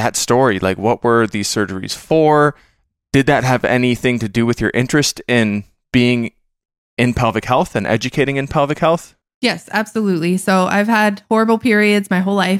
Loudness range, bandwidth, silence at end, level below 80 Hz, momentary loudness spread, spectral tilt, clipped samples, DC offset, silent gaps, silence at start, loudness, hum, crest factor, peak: 2 LU; 16 kHz; 0 s; -44 dBFS; 6 LU; -5 dB/octave; under 0.1%; under 0.1%; 6.78-6.97 s, 9.34-9.41 s; 0 s; -16 LUFS; none; 14 dB; -2 dBFS